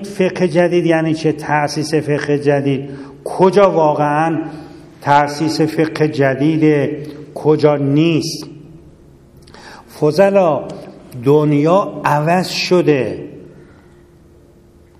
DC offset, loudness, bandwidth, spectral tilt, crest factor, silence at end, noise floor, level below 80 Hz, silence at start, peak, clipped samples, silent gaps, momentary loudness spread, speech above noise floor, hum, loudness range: under 0.1%; -15 LUFS; 14 kHz; -6.5 dB/octave; 16 dB; 1.55 s; -46 dBFS; -52 dBFS; 0 s; 0 dBFS; under 0.1%; none; 16 LU; 32 dB; none; 3 LU